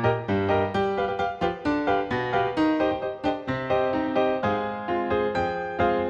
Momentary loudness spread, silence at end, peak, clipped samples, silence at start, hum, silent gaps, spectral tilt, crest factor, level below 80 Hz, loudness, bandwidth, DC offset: 5 LU; 0 s; -10 dBFS; under 0.1%; 0 s; none; none; -7.5 dB/octave; 16 dB; -50 dBFS; -25 LUFS; 8 kHz; under 0.1%